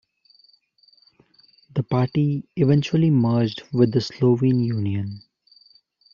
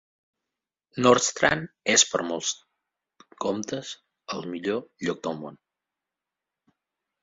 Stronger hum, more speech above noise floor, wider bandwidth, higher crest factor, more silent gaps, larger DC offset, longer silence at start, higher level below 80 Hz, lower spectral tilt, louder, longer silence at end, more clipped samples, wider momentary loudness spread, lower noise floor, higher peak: neither; second, 39 dB vs 62 dB; second, 7.2 kHz vs 8 kHz; second, 18 dB vs 24 dB; neither; neither; first, 1.75 s vs 0.95 s; about the same, -60 dBFS vs -64 dBFS; first, -8 dB/octave vs -2.5 dB/octave; first, -21 LUFS vs -25 LUFS; second, 0.95 s vs 1.7 s; neither; second, 11 LU vs 18 LU; second, -59 dBFS vs -88 dBFS; about the same, -6 dBFS vs -4 dBFS